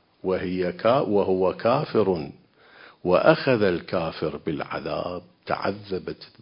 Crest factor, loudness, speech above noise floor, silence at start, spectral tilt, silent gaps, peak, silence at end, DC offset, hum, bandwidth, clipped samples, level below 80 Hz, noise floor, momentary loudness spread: 22 dB; -24 LUFS; 27 dB; 0.25 s; -11 dB/octave; none; -2 dBFS; 0.15 s; under 0.1%; none; 5.4 kHz; under 0.1%; -54 dBFS; -51 dBFS; 12 LU